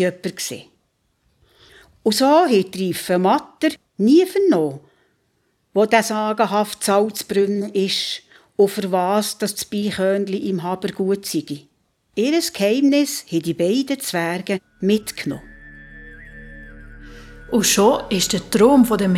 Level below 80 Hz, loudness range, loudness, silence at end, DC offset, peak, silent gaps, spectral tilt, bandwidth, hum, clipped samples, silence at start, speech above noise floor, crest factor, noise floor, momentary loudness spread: -50 dBFS; 5 LU; -19 LUFS; 0 s; under 0.1%; -2 dBFS; none; -4.5 dB/octave; 17 kHz; none; under 0.1%; 0 s; 48 dB; 18 dB; -67 dBFS; 15 LU